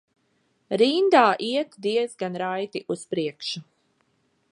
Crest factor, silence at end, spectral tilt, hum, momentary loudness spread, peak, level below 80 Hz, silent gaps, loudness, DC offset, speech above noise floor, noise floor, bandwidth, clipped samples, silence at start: 22 dB; 0.9 s; -4.5 dB/octave; none; 14 LU; -2 dBFS; -80 dBFS; none; -24 LUFS; under 0.1%; 46 dB; -69 dBFS; 11 kHz; under 0.1%; 0.7 s